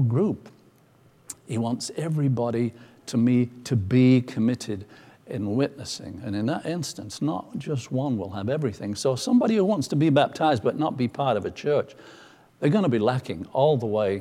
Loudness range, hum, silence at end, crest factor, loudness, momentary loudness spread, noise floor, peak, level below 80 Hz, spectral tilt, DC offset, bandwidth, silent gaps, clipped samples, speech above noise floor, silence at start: 6 LU; none; 0 s; 18 dB; -25 LUFS; 11 LU; -57 dBFS; -6 dBFS; -64 dBFS; -6.5 dB/octave; under 0.1%; 14 kHz; none; under 0.1%; 33 dB; 0 s